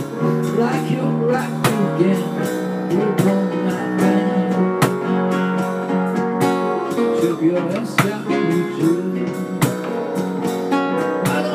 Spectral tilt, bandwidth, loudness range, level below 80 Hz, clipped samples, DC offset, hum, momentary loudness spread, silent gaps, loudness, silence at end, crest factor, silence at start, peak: -6.5 dB/octave; 15.5 kHz; 2 LU; -62 dBFS; under 0.1%; under 0.1%; none; 5 LU; none; -19 LUFS; 0 s; 18 dB; 0 s; 0 dBFS